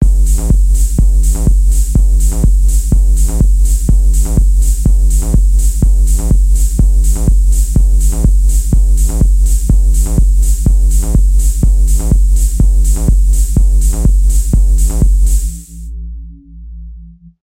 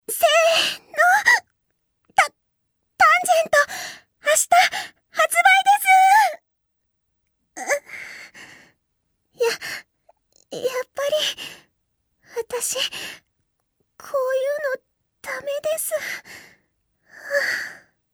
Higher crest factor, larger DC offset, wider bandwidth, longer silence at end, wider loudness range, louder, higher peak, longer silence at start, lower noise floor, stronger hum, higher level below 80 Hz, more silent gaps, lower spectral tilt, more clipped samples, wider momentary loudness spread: second, 8 dB vs 20 dB; neither; second, 15.5 kHz vs over 20 kHz; about the same, 0.35 s vs 0.4 s; second, 1 LU vs 12 LU; first, -13 LUFS vs -19 LUFS; about the same, 0 dBFS vs -2 dBFS; about the same, 0 s vs 0.1 s; second, -34 dBFS vs -74 dBFS; neither; first, -8 dBFS vs -70 dBFS; neither; first, -6.5 dB/octave vs 1 dB/octave; neither; second, 1 LU vs 20 LU